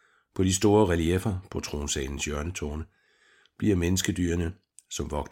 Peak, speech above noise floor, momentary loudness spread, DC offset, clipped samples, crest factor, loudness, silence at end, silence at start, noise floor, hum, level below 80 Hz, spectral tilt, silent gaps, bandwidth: -8 dBFS; 36 dB; 14 LU; under 0.1%; under 0.1%; 20 dB; -27 LUFS; 0.05 s; 0.35 s; -63 dBFS; none; -42 dBFS; -5 dB/octave; none; 16.5 kHz